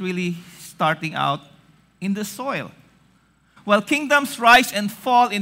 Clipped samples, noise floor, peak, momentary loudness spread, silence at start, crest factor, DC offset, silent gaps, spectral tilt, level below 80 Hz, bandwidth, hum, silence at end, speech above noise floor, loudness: under 0.1%; -59 dBFS; -4 dBFS; 17 LU; 0 s; 18 dB; under 0.1%; none; -4 dB/octave; -58 dBFS; 16 kHz; none; 0 s; 39 dB; -20 LUFS